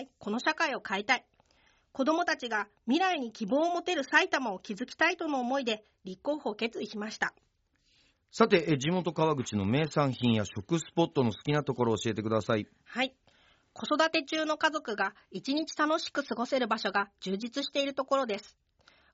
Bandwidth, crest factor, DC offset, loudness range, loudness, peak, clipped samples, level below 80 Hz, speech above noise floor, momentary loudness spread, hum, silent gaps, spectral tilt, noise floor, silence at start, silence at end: 8 kHz; 22 dB; under 0.1%; 3 LU; -30 LUFS; -10 dBFS; under 0.1%; -70 dBFS; 41 dB; 8 LU; none; none; -3.5 dB/octave; -72 dBFS; 0 s; 0.65 s